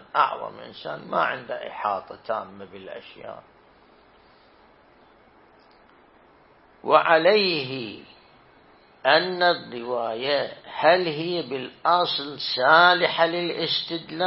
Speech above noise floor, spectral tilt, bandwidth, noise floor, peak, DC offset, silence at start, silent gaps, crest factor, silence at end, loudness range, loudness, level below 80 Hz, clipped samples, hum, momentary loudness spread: 32 dB; -8 dB/octave; 5.8 kHz; -55 dBFS; -2 dBFS; under 0.1%; 0.15 s; none; 22 dB; 0 s; 13 LU; -22 LUFS; -70 dBFS; under 0.1%; none; 20 LU